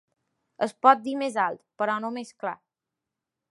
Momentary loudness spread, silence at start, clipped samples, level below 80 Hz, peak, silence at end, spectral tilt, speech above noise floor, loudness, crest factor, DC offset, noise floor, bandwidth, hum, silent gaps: 15 LU; 0.6 s; under 0.1%; -84 dBFS; -4 dBFS; 0.95 s; -4.5 dB/octave; 61 dB; -26 LUFS; 24 dB; under 0.1%; -87 dBFS; 11.5 kHz; none; none